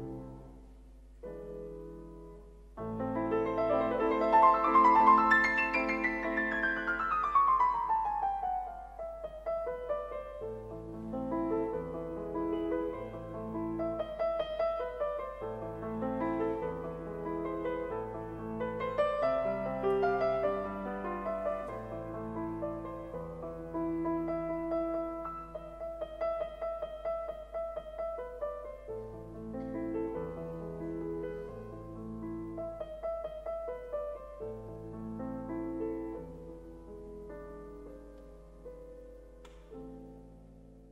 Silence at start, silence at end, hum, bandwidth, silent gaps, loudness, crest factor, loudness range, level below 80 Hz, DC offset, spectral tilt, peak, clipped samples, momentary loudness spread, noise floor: 0 s; 0 s; none; 11.5 kHz; none; -33 LUFS; 22 dB; 15 LU; -54 dBFS; under 0.1%; -7.5 dB/octave; -12 dBFS; under 0.1%; 19 LU; -54 dBFS